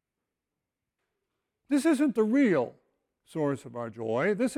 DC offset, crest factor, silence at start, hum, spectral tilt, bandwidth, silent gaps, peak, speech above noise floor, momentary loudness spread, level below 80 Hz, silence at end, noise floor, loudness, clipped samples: under 0.1%; 14 dB; 1.7 s; none; -6.5 dB/octave; 16 kHz; none; -14 dBFS; 61 dB; 12 LU; -74 dBFS; 0 s; -87 dBFS; -28 LUFS; under 0.1%